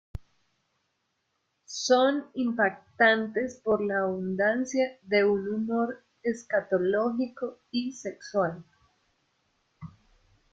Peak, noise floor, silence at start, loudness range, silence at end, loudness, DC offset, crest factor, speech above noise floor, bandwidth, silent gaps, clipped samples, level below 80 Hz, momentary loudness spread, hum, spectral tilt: -10 dBFS; -77 dBFS; 0.15 s; 6 LU; 0.65 s; -27 LUFS; under 0.1%; 20 dB; 50 dB; 8 kHz; none; under 0.1%; -62 dBFS; 15 LU; none; -4.5 dB/octave